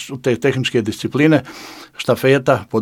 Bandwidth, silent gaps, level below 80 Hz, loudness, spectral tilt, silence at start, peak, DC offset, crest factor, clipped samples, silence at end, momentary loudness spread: 18 kHz; none; -56 dBFS; -17 LUFS; -6 dB/octave; 0 s; 0 dBFS; under 0.1%; 18 dB; under 0.1%; 0 s; 16 LU